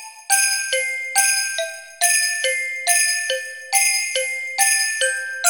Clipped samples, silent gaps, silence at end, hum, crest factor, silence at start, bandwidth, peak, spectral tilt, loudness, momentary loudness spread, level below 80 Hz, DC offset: under 0.1%; none; 0 s; none; 20 dB; 0 s; 17 kHz; 0 dBFS; 5.5 dB/octave; -18 LUFS; 7 LU; -78 dBFS; 0.1%